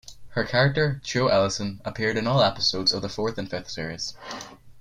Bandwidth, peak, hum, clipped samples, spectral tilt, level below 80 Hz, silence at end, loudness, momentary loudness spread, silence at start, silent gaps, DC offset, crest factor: 11.5 kHz; -8 dBFS; none; under 0.1%; -4.5 dB/octave; -52 dBFS; 0 s; -24 LUFS; 12 LU; 0.05 s; none; under 0.1%; 18 dB